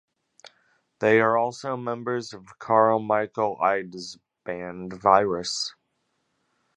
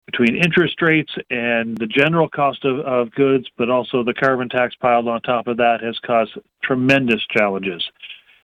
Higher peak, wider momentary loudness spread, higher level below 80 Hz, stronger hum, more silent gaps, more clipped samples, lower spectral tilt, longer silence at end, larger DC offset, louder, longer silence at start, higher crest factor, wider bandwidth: about the same, -2 dBFS vs -2 dBFS; first, 17 LU vs 7 LU; second, -66 dBFS vs -58 dBFS; neither; neither; neither; second, -4.5 dB/octave vs -6.5 dB/octave; first, 1.05 s vs 0.3 s; neither; second, -24 LUFS vs -18 LUFS; first, 1 s vs 0.1 s; first, 24 dB vs 16 dB; about the same, 11 kHz vs 11.5 kHz